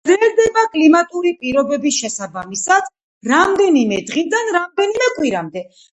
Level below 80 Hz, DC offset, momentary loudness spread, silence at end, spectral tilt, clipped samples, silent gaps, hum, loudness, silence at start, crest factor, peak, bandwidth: -56 dBFS; under 0.1%; 12 LU; 0.3 s; -3 dB/octave; under 0.1%; 3.03-3.21 s; none; -16 LUFS; 0.05 s; 16 dB; 0 dBFS; 8.4 kHz